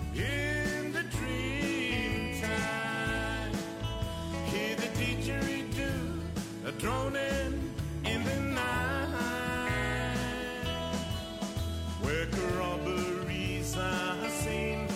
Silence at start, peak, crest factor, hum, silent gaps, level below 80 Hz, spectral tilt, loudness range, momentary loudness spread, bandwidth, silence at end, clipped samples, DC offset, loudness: 0 s; -20 dBFS; 14 dB; none; none; -42 dBFS; -5 dB/octave; 2 LU; 5 LU; 16 kHz; 0 s; under 0.1%; under 0.1%; -33 LUFS